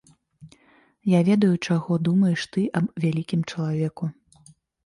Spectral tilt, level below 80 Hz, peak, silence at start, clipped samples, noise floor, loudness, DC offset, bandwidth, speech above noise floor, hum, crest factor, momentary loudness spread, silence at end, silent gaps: -7.5 dB/octave; -64 dBFS; -8 dBFS; 0.4 s; under 0.1%; -59 dBFS; -23 LUFS; under 0.1%; 11.5 kHz; 37 dB; none; 14 dB; 9 LU; 0.75 s; none